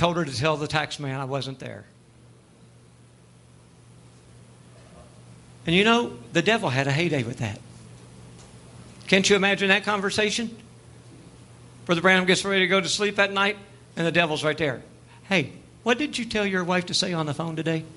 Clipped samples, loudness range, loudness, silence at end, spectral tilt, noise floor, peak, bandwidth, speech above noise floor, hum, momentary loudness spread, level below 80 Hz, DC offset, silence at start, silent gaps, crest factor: under 0.1%; 8 LU; -23 LUFS; 0.05 s; -4 dB/octave; -52 dBFS; -4 dBFS; 11.5 kHz; 29 dB; none; 15 LU; -58 dBFS; under 0.1%; 0 s; none; 22 dB